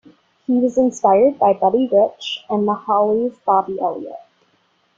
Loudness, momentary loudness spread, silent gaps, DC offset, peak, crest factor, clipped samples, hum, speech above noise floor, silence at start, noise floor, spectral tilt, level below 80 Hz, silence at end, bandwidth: -17 LUFS; 10 LU; none; under 0.1%; -2 dBFS; 16 dB; under 0.1%; none; 45 dB; 0.5 s; -62 dBFS; -6 dB/octave; -62 dBFS; 0.8 s; 7.8 kHz